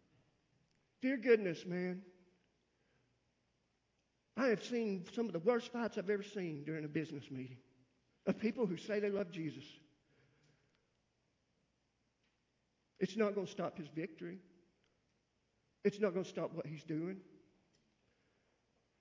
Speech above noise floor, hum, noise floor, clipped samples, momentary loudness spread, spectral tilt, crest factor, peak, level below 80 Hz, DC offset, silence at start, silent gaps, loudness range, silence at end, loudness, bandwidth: 43 dB; none; -82 dBFS; under 0.1%; 13 LU; -6.5 dB/octave; 24 dB; -18 dBFS; -84 dBFS; under 0.1%; 1 s; none; 5 LU; 1.65 s; -40 LUFS; 7.6 kHz